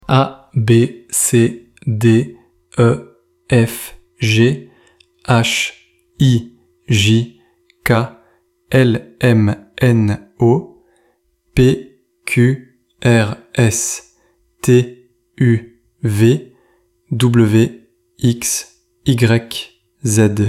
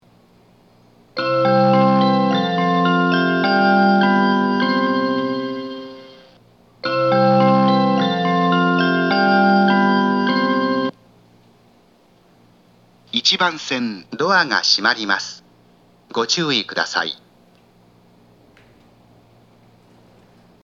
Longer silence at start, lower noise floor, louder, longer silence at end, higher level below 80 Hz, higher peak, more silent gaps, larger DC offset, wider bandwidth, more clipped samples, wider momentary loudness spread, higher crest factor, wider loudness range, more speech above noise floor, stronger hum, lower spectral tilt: second, 0.1 s vs 1.15 s; first, -60 dBFS vs -54 dBFS; about the same, -15 LUFS vs -17 LUFS; second, 0 s vs 3.5 s; first, -44 dBFS vs -68 dBFS; about the same, 0 dBFS vs 0 dBFS; neither; neither; first, 15.5 kHz vs 7.4 kHz; neither; about the same, 12 LU vs 11 LU; about the same, 14 dB vs 18 dB; second, 2 LU vs 8 LU; first, 47 dB vs 34 dB; neither; about the same, -5.5 dB/octave vs -5 dB/octave